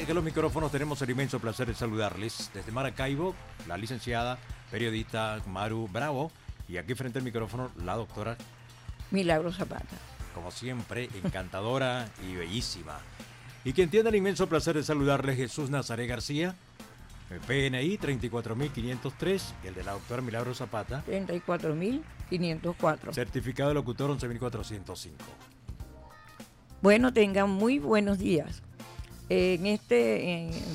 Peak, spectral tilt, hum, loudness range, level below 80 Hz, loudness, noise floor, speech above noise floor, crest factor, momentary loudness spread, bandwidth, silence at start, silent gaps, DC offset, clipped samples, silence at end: -10 dBFS; -6 dB/octave; none; 7 LU; -50 dBFS; -31 LUFS; -51 dBFS; 21 dB; 22 dB; 19 LU; 16 kHz; 0 s; none; under 0.1%; under 0.1%; 0 s